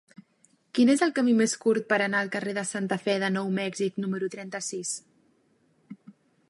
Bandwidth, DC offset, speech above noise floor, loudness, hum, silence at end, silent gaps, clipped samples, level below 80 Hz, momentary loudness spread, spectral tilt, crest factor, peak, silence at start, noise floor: 11.5 kHz; under 0.1%; 41 dB; -27 LUFS; none; 0.4 s; none; under 0.1%; -80 dBFS; 10 LU; -4.5 dB/octave; 18 dB; -10 dBFS; 0.75 s; -67 dBFS